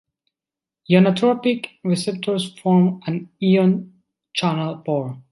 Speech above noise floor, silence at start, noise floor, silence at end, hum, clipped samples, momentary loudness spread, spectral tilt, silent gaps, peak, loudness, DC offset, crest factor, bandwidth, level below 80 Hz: 70 dB; 0.9 s; -89 dBFS; 0.1 s; none; under 0.1%; 9 LU; -7 dB/octave; none; -2 dBFS; -20 LUFS; under 0.1%; 18 dB; 11.5 kHz; -66 dBFS